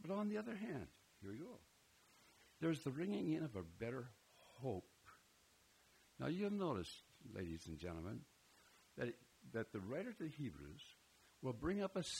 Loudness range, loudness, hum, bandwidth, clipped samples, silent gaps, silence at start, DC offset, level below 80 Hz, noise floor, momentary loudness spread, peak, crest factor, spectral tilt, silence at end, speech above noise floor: 4 LU; -47 LUFS; none; 16 kHz; under 0.1%; none; 0 s; under 0.1%; -72 dBFS; -73 dBFS; 19 LU; -30 dBFS; 18 dB; -6 dB/octave; 0 s; 27 dB